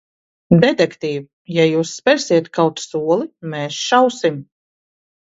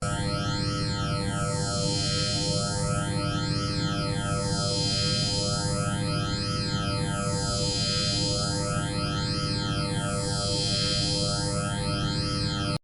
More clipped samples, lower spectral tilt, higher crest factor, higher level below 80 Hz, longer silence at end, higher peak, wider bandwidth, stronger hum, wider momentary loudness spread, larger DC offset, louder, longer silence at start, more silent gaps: neither; first, -5.5 dB/octave vs -4 dB/octave; about the same, 18 dB vs 14 dB; second, -58 dBFS vs -42 dBFS; first, 0.9 s vs 0.05 s; first, 0 dBFS vs -14 dBFS; second, 8 kHz vs 11.5 kHz; neither; first, 11 LU vs 4 LU; neither; first, -17 LUFS vs -27 LUFS; first, 0.5 s vs 0 s; first, 1.33-1.45 s vs none